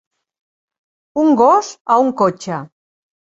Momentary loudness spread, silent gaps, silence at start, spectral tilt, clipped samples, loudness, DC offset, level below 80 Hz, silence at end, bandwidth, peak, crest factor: 14 LU; 1.81-1.85 s; 1.15 s; -6 dB/octave; under 0.1%; -14 LUFS; under 0.1%; -62 dBFS; 0.6 s; 8 kHz; 0 dBFS; 16 dB